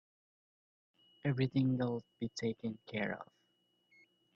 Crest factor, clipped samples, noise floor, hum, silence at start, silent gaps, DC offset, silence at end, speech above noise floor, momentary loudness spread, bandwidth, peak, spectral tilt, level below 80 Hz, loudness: 18 dB; under 0.1%; -78 dBFS; 60 Hz at -55 dBFS; 1.25 s; none; under 0.1%; 1.1 s; 41 dB; 11 LU; 7.6 kHz; -22 dBFS; -7 dB/octave; -74 dBFS; -38 LUFS